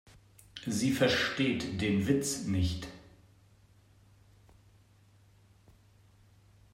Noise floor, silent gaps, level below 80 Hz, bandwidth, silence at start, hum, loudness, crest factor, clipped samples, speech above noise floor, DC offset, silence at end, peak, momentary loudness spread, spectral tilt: -62 dBFS; none; -56 dBFS; 16 kHz; 0.55 s; none; -31 LUFS; 20 dB; under 0.1%; 32 dB; under 0.1%; 3.65 s; -14 dBFS; 15 LU; -4.5 dB/octave